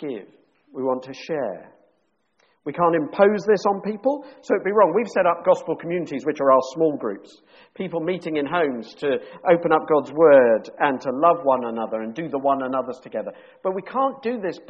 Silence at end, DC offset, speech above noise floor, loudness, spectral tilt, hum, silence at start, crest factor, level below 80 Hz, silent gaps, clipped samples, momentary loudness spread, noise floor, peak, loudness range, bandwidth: 0.1 s; under 0.1%; 47 dB; -21 LUFS; -5 dB/octave; none; 0 s; 18 dB; -68 dBFS; none; under 0.1%; 13 LU; -69 dBFS; -4 dBFS; 5 LU; 7.6 kHz